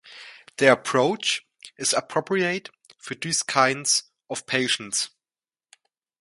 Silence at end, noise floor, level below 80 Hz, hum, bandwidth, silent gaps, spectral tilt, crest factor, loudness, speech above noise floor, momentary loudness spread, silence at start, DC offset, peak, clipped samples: 1.15 s; under -90 dBFS; -72 dBFS; none; 11.5 kHz; none; -2 dB/octave; 26 dB; -23 LUFS; over 67 dB; 16 LU; 0.05 s; under 0.1%; 0 dBFS; under 0.1%